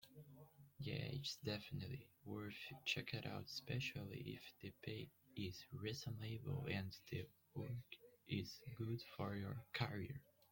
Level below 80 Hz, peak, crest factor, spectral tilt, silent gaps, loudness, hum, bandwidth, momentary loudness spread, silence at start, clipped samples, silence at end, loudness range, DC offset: -74 dBFS; -26 dBFS; 22 dB; -5.5 dB/octave; none; -49 LUFS; none; 17 kHz; 10 LU; 0 s; under 0.1%; 0.3 s; 2 LU; under 0.1%